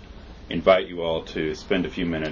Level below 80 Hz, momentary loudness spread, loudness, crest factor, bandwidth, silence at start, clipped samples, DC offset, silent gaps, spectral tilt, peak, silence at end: -44 dBFS; 14 LU; -24 LUFS; 20 dB; 7.4 kHz; 0 s; under 0.1%; under 0.1%; none; -6 dB/octave; -4 dBFS; 0 s